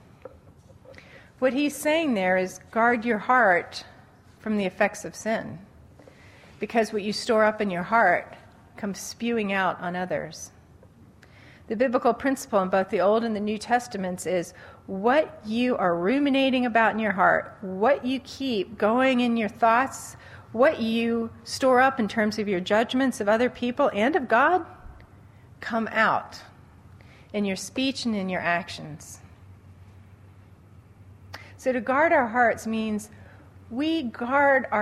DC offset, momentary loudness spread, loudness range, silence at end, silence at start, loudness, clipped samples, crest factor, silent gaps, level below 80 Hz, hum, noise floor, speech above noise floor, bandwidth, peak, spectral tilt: under 0.1%; 16 LU; 7 LU; 0 s; 0.25 s; -24 LUFS; under 0.1%; 20 dB; none; -60 dBFS; none; -52 dBFS; 28 dB; 15 kHz; -6 dBFS; -4.5 dB/octave